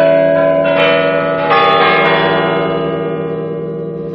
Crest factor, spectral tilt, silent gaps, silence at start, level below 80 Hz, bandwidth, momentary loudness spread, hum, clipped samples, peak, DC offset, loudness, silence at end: 12 dB; -7.5 dB/octave; none; 0 s; -48 dBFS; 5.8 kHz; 11 LU; none; under 0.1%; 0 dBFS; under 0.1%; -12 LUFS; 0 s